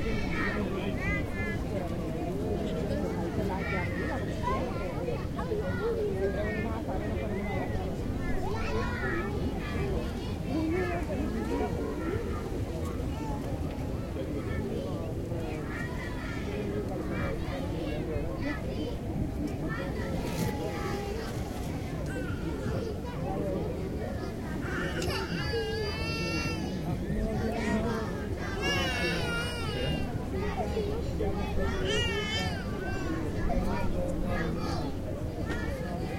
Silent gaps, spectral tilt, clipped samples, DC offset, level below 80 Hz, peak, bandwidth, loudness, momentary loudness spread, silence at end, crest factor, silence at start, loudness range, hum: none; -6 dB/octave; under 0.1%; under 0.1%; -40 dBFS; -16 dBFS; 16 kHz; -33 LUFS; 5 LU; 0 s; 16 dB; 0 s; 3 LU; none